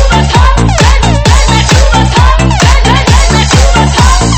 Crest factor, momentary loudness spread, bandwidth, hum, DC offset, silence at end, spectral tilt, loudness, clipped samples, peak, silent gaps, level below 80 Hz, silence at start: 6 dB; 1 LU; 11 kHz; none; under 0.1%; 0 s; -4.5 dB/octave; -6 LUFS; 5%; 0 dBFS; none; -8 dBFS; 0 s